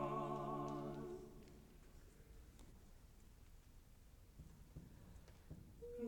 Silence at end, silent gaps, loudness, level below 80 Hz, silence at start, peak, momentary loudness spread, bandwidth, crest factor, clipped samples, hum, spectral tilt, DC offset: 0 s; none; -51 LUFS; -64 dBFS; 0 s; -32 dBFS; 21 LU; 19 kHz; 20 dB; under 0.1%; none; -7 dB/octave; under 0.1%